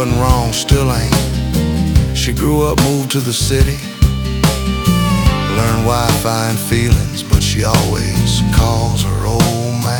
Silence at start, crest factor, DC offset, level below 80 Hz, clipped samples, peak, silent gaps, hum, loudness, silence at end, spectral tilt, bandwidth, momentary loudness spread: 0 s; 14 dB; under 0.1%; -20 dBFS; under 0.1%; 0 dBFS; none; none; -14 LUFS; 0 s; -5 dB/octave; 19 kHz; 3 LU